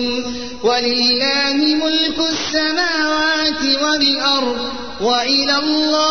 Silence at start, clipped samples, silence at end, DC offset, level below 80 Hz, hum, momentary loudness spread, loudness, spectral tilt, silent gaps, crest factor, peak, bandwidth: 0 s; under 0.1%; 0 s; 1%; -48 dBFS; none; 7 LU; -15 LUFS; -2 dB/octave; none; 12 dB; -4 dBFS; 6.6 kHz